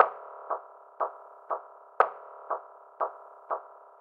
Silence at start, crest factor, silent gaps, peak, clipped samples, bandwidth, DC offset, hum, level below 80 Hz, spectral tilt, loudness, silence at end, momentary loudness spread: 0 s; 30 dB; none; -2 dBFS; under 0.1%; 5.6 kHz; under 0.1%; none; under -90 dBFS; -4.5 dB/octave; -33 LUFS; 0.35 s; 22 LU